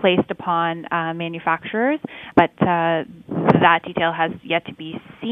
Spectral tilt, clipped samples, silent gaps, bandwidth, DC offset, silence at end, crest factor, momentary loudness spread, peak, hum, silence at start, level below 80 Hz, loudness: -8.5 dB/octave; under 0.1%; none; 5.6 kHz; under 0.1%; 0 s; 20 dB; 11 LU; 0 dBFS; none; 0 s; -56 dBFS; -20 LUFS